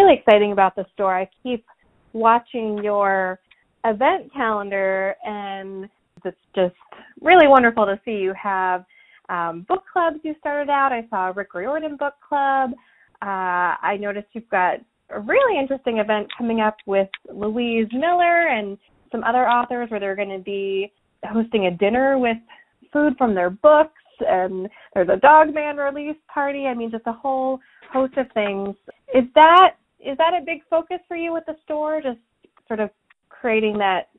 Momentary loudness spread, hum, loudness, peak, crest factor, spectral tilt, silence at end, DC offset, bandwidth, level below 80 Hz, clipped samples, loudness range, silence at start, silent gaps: 15 LU; none; -20 LUFS; 0 dBFS; 20 dB; -7.5 dB/octave; 0.15 s; under 0.1%; 4.1 kHz; -58 dBFS; under 0.1%; 6 LU; 0 s; none